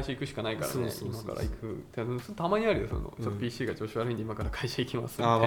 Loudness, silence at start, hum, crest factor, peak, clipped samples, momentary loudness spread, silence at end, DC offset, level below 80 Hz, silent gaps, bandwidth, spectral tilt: -33 LUFS; 0 s; none; 22 dB; -8 dBFS; under 0.1%; 8 LU; 0 s; under 0.1%; -46 dBFS; none; 19 kHz; -6 dB/octave